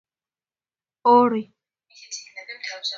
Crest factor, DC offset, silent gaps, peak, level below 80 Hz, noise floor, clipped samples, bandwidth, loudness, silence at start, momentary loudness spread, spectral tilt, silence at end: 20 dB; under 0.1%; none; -4 dBFS; -74 dBFS; under -90 dBFS; under 0.1%; 7.6 kHz; -19 LUFS; 1.05 s; 19 LU; -3.5 dB/octave; 0 s